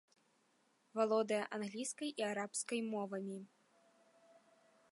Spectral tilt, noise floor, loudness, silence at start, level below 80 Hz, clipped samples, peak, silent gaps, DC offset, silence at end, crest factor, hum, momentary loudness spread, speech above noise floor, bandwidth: -3.5 dB/octave; -76 dBFS; -40 LUFS; 0.95 s; under -90 dBFS; under 0.1%; -24 dBFS; none; under 0.1%; 1.45 s; 18 dB; none; 10 LU; 37 dB; 11.5 kHz